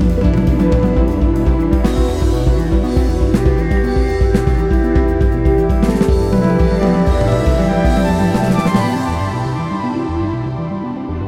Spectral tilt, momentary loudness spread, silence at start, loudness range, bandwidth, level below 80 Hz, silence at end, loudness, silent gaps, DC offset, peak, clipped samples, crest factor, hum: -8 dB/octave; 6 LU; 0 s; 2 LU; 13 kHz; -18 dBFS; 0 s; -15 LUFS; none; under 0.1%; -2 dBFS; under 0.1%; 12 dB; none